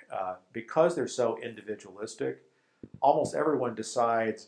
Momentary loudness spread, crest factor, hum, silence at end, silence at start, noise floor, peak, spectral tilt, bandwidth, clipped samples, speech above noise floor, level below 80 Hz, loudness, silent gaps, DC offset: 15 LU; 20 dB; none; 0.05 s; 0.1 s; -52 dBFS; -10 dBFS; -5 dB/octave; 11 kHz; under 0.1%; 22 dB; -74 dBFS; -29 LUFS; none; under 0.1%